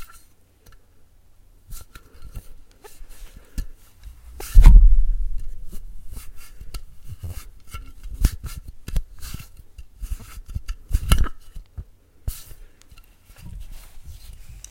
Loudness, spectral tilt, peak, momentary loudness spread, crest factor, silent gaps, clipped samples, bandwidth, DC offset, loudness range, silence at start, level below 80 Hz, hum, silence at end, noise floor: -23 LUFS; -5 dB/octave; 0 dBFS; 25 LU; 20 dB; none; 0.2%; 16 kHz; under 0.1%; 21 LU; 0 s; -22 dBFS; none; 0.3 s; -52 dBFS